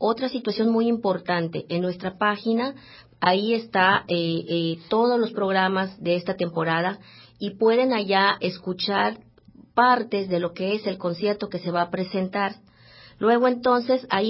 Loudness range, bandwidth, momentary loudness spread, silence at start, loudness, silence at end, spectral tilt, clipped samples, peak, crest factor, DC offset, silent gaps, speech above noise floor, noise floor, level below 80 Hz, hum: 2 LU; 5.8 kHz; 8 LU; 0 s; -23 LUFS; 0 s; -10 dB/octave; under 0.1%; -4 dBFS; 20 dB; under 0.1%; none; 29 dB; -52 dBFS; -64 dBFS; none